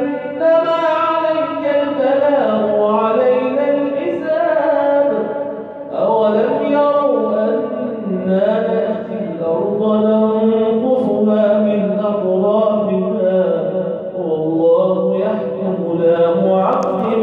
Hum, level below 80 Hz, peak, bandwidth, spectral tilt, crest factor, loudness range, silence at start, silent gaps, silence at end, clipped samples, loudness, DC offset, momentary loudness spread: none; -66 dBFS; -4 dBFS; 6.6 kHz; -9 dB/octave; 12 dB; 2 LU; 0 s; none; 0 s; under 0.1%; -16 LUFS; under 0.1%; 7 LU